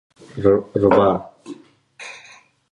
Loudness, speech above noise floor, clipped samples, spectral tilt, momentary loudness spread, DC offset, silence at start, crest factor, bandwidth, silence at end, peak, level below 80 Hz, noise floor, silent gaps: -17 LUFS; 31 dB; under 0.1%; -7.5 dB/octave; 24 LU; under 0.1%; 0.35 s; 20 dB; 10 kHz; 0.55 s; -2 dBFS; -48 dBFS; -48 dBFS; none